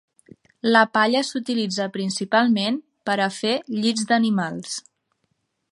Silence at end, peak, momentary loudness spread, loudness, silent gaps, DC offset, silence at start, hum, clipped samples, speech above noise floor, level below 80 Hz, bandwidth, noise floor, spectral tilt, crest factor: 0.9 s; -2 dBFS; 10 LU; -22 LUFS; none; under 0.1%; 0.65 s; none; under 0.1%; 51 dB; -74 dBFS; 11.5 kHz; -72 dBFS; -4 dB/octave; 22 dB